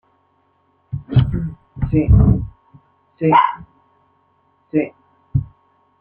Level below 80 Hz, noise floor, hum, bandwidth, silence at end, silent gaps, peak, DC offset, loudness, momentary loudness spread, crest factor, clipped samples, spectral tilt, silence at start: -28 dBFS; -61 dBFS; none; 4.2 kHz; 0.55 s; none; -2 dBFS; under 0.1%; -18 LUFS; 18 LU; 18 dB; under 0.1%; -11 dB/octave; 0.9 s